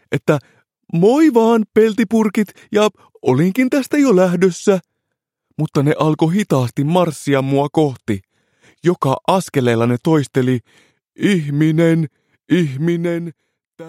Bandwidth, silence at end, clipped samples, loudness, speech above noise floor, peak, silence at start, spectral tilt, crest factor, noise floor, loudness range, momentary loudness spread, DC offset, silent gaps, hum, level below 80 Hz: 16 kHz; 0 s; under 0.1%; -16 LUFS; 62 dB; 0 dBFS; 0.1 s; -7 dB/octave; 16 dB; -77 dBFS; 3 LU; 8 LU; under 0.1%; 13.67-13.71 s; none; -60 dBFS